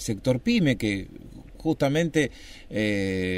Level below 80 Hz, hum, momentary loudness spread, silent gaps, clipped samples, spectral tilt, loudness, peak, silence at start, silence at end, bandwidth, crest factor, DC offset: -46 dBFS; none; 13 LU; none; under 0.1%; -6 dB/octave; -25 LUFS; -8 dBFS; 0 s; 0 s; 16 kHz; 18 dB; under 0.1%